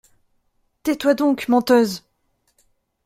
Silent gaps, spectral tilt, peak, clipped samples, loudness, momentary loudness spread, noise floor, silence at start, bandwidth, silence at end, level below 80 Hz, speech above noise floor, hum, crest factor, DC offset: none; -4.5 dB/octave; -2 dBFS; under 0.1%; -19 LUFS; 11 LU; -68 dBFS; 0.85 s; 16 kHz; 1.1 s; -60 dBFS; 50 dB; none; 18 dB; under 0.1%